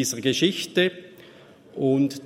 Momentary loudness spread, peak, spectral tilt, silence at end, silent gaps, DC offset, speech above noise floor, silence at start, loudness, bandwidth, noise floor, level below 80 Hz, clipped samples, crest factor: 14 LU; -6 dBFS; -4 dB/octave; 0 s; none; under 0.1%; 26 dB; 0 s; -23 LUFS; 16 kHz; -49 dBFS; -68 dBFS; under 0.1%; 18 dB